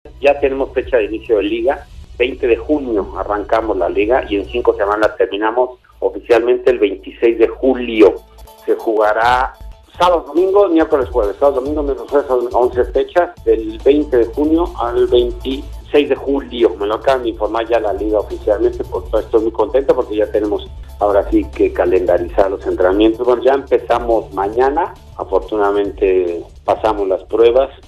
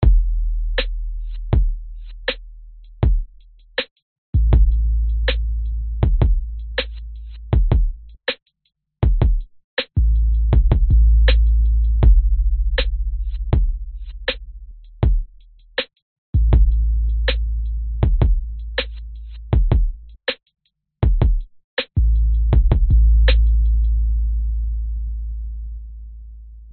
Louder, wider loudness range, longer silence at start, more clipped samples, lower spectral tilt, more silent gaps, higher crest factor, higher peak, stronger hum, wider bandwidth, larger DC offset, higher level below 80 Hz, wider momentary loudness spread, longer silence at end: first, -15 LUFS vs -21 LUFS; second, 2 LU vs 7 LU; about the same, 0.05 s vs 0 s; neither; about the same, -6.5 dB/octave vs -5.5 dB/octave; second, none vs 3.91-3.96 s, 4.02-4.33 s, 9.64-9.77 s, 16.02-16.33 s, 21.64-21.77 s; about the same, 14 dB vs 16 dB; about the same, 0 dBFS vs -2 dBFS; neither; first, 13 kHz vs 4.5 kHz; neither; second, -34 dBFS vs -18 dBFS; second, 7 LU vs 16 LU; about the same, 0.1 s vs 0 s